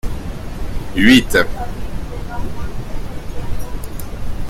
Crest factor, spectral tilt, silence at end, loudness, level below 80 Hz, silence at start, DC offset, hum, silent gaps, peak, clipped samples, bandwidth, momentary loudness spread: 18 dB; -5 dB/octave; 0 s; -18 LUFS; -26 dBFS; 0.05 s; under 0.1%; none; none; 0 dBFS; under 0.1%; 16 kHz; 19 LU